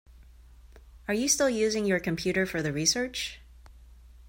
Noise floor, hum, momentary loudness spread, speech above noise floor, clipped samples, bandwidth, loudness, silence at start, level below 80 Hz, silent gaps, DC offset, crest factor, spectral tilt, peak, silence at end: -52 dBFS; none; 10 LU; 25 dB; under 0.1%; 16.5 kHz; -27 LUFS; 0.4 s; -52 dBFS; none; under 0.1%; 20 dB; -3 dB/octave; -10 dBFS; 0 s